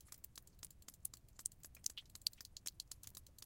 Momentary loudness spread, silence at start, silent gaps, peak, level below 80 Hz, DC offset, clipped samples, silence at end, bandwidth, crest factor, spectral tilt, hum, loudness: 12 LU; 0 s; none; -18 dBFS; -68 dBFS; under 0.1%; under 0.1%; 0 s; 17 kHz; 36 dB; 0.5 dB/octave; none; -49 LUFS